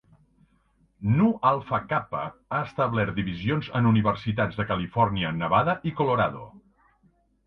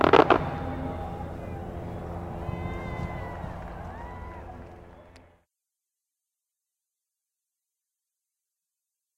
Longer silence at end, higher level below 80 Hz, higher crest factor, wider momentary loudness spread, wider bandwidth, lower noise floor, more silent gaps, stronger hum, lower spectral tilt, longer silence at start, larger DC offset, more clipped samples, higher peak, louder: second, 0.9 s vs 3.95 s; second, -52 dBFS vs -46 dBFS; second, 20 dB vs 30 dB; second, 8 LU vs 19 LU; second, 5.8 kHz vs 16 kHz; second, -65 dBFS vs -87 dBFS; neither; neither; first, -9.5 dB/octave vs -7 dB/octave; first, 1 s vs 0 s; neither; neither; second, -6 dBFS vs 0 dBFS; first, -25 LUFS vs -30 LUFS